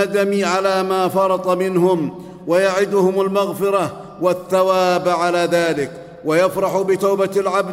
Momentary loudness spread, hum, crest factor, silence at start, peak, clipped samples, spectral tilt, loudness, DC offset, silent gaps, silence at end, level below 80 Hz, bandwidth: 5 LU; none; 14 dB; 0 s; -4 dBFS; under 0.1%; -5.5 dB/octave; -18 LUFS; under 0.1%; none; 0 s; -58 dBFS; 16 kHz